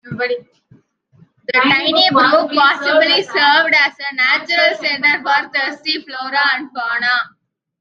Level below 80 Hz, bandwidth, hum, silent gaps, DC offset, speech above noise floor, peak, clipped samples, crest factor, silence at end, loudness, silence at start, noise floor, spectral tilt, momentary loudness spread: -68 dBFS; 7.6 kHz; none; none; under 0.1%; 36 dB; 0 dBFS; under 0.1%; 14 dB; 0.55 s; -14 LUFS; 0.05 s; -51 dBFS; -3.5 dB/octave; 10 LU